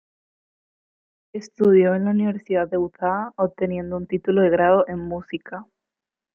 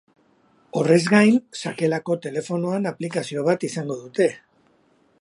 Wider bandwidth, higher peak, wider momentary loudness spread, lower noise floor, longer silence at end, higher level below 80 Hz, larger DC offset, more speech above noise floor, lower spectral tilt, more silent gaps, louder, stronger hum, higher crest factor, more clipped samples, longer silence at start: second, 7 kHz vs 11.5 kHz; about the same, -4 dBFS vs -2 dBFS; first, 17 LU vs 12 LU; first, -88 dBFS vs -61 dBFS; second, 0.7 s vs 0.85 s; first, -58 dBFS vs -70 dBFS; neither; first, 67 dB vs 40 dB; first, -8.5 dB/octave vs -6 dB/octave; neither; about the same, -21 LUFS vs -22 LUFS; neither; about the same, 18 dB vs 20 dB; neither; first, 1.35 s vs 0.75 s